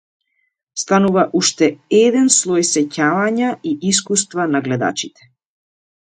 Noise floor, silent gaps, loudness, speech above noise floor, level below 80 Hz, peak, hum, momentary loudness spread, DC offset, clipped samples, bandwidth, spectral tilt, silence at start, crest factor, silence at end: -69 dBFS; none; -16 LUFS; 53 dB; -62 dBFS; 0 dBFS; none; 8 LU; under 0.1%; under 0.1%; 9.6 kHz; -3.5 dB/octave; 0.75 s; 18 dB; 1.05 s